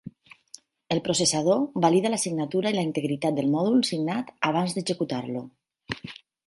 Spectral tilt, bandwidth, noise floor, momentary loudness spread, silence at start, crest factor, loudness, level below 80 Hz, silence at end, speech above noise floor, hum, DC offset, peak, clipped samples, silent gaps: -4.5 dB/octave; 11.5 kHz; -52 dBFS; 14 LU; 0.05 s; 20 dB; -25 LUFS; -66 dBFS; 0.35 s; 27 dB; none; under 0.1%; -6 dBFS; under 0.1%; none